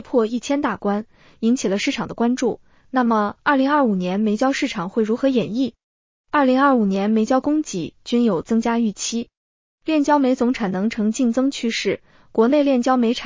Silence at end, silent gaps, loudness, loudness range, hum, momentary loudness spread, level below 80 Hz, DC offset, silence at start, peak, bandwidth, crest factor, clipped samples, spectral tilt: 0 s; 5.84-6.24 s, 9.37-9.78 s; -20 LUFS; 2 LU; none; 8 LU; -56 dBFS; under 0.1%; 0.05 s; -6 dBFS; 7.6 kHz; 14 dB; under 0.1%; -5 dB/octave